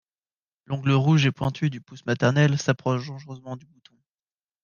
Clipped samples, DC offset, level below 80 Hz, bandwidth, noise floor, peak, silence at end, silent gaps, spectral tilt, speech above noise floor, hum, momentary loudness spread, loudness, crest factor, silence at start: under 0.1%; under 0.1%; -58 dBFS; 7.2 kHz; under -90 dBFS; -6 dBFS; 1.05 s; none; -6.5 dB/octave; over 67 dB; none; 18 LU; -23 LUFS; 18 dB; 0.7 s